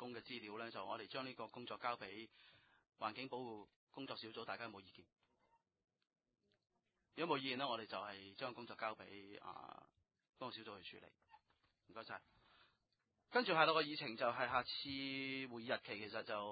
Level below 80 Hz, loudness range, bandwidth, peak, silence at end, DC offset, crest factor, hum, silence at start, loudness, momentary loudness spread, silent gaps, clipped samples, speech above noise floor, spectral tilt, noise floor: -82 dBFS; 15 LU; 4.9 kHz; -18 dBFS; 0 s; under 0.1%; 28 dB; none; 0 s; -44 LUFS; 17 LU; 3.76-3.87 s; under 0.1%; 42 dB; -1.5 dB/octave; -87 dBFS